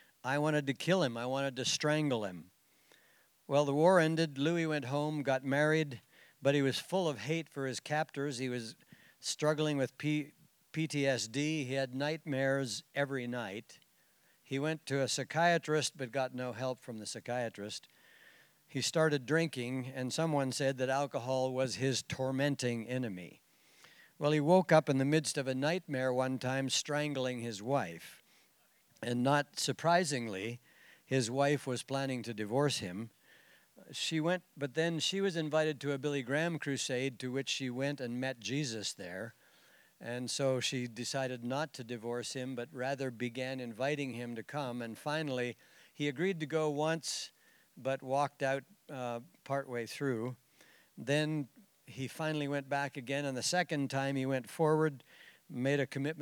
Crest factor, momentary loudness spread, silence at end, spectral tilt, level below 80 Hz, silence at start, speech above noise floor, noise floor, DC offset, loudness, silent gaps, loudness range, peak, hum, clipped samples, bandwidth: 22 dB; 11 LU; 0 s; -4.5 dB/octave; -86 dBFS; 0.25 s; 35 dB; -70 dBFS; under 0.1%; -35 LUFS; none; 6 LU; -14 dBFS; none; under 0.1%; over 20 kHz